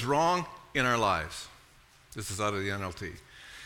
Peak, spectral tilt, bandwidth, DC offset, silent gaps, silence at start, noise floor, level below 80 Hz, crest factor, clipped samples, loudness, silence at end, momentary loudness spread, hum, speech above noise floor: -12 dBFS; -4 dB/octave; 18 kHz; under 0.1%; none; 0 s; -59 dBFS; -56 dBFS; 20 dB; under 0.1%; -30 LUFS; 0 s; 20 LU; none; 29 dB